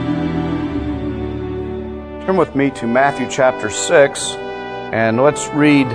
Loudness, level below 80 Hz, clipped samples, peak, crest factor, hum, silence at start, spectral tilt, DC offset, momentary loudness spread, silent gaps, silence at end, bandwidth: -17 LUFS; -38 dBFS; under 0.1%; -2 dBFS; 16 dB; none; 0 s; -5 dB/octave; under 0.1%; 13 LU; none; 0 s; 10.5 kHz